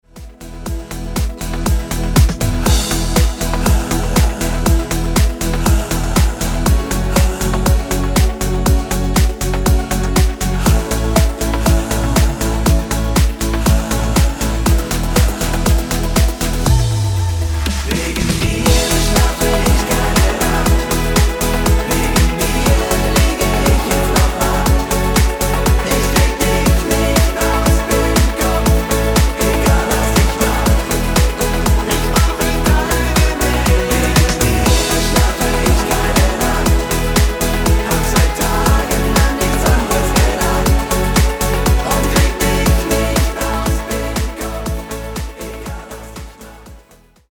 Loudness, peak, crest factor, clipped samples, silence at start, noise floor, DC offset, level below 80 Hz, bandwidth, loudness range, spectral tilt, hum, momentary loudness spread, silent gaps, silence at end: -15 LUFS; 0 dBFS; 14 dB; under 0.1%; 0.15 s; -47 dBFS; under 0.1%; -18 dBFS; over 20 kHz; 2 LU; -4.5 dB/octave; none; 5 LU; none; 0.55 s